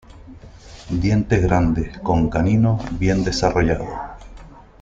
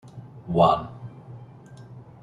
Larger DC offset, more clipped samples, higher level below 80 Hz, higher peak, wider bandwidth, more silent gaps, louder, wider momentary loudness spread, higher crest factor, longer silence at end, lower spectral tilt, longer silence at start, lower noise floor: neither; neither; first, -32 dBFS vs -54 dBFS; first, -2 dBFS vs -6 dBFS; second, 7.8 kHz vs 10.5 kHz; neither; first, -19 LUFS vs -22 LUFS; second, 9 LU vs 26 LU; about the same, 18 dB vs 22 dB; about the same, 0.2 s vs 0.2 s; about the same, -7 dB/octave vs -8 dB/octave; about the same, 0.15 s vs 0.05 s; second, -41 dBFS vs -45 dBFS